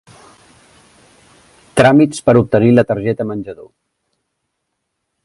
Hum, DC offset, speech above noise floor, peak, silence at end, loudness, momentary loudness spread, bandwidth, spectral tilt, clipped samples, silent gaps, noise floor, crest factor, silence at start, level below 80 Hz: none; under 0.1%; 61 dB; 0 dBFS; 1.6 s; -13 LUFS; 13 LU; 11.5 kHz; -7 dB/octave; under 0.1%; none; -73 dBFS; 16 dB; 1.75 s; -48 dBFS